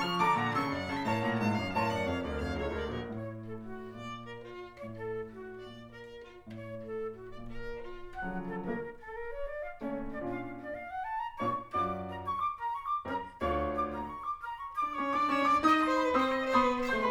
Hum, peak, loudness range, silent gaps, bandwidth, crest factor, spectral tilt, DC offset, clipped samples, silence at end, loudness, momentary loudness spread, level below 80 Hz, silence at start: none; -14 dBFS; 13 LU; none; over 20 kHz; 20 dB; -6 dB/octave; under 0.1%; under 0.1%; 0 s; -33 LUFS; 17 LU; -52 dBFS; 0 s